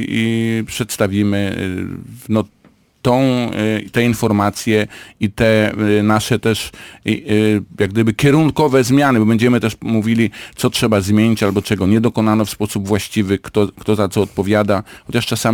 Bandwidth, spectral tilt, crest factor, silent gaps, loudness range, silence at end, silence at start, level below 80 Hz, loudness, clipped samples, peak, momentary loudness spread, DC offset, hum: 19 kHz; -6 dB/octave; 12 dB; none; 4 LU; 0 s; 0 s; -44 dBFS; -16 LUFS; under 0.1%; -2 dBFS; 8 LU; under 0.1%; none